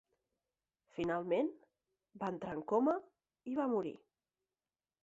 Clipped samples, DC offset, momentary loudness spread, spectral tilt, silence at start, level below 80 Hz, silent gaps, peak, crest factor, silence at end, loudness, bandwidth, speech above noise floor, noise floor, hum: under 0.1%; under 0.1%; 14 LU; -6 dB/octave; 0.95 s; -76 dBFS; none; -22 dBFS; 18 dB; 1.1 s; -38 LUFS; 7.8 kHz; over 54 dB; under -90 dBFS; none